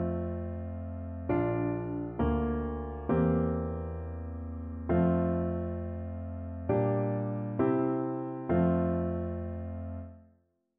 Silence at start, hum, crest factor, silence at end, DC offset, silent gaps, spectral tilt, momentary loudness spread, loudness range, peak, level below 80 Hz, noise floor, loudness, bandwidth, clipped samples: 0 s; none; 16 dB; 0.55 s; under 0.1%; none; -10 dB/octave; 12 LU; 2 LU; -16 dBFS; -44 dBFS; -69 dBFS; -32 LUFS; 3.6 kHz; under 0.1%